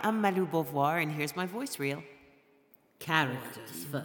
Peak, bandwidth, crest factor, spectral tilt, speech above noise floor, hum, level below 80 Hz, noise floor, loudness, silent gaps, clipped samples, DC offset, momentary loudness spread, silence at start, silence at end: -10 dBFS; 19.5 kHz; 22 dB; -5 dB/octave; 33 dB; none; -76 dBFS; -64 dBFS; -32 LUFS; none; under 0.1%; under 0.1%; 13 LU; 0 s; 0 s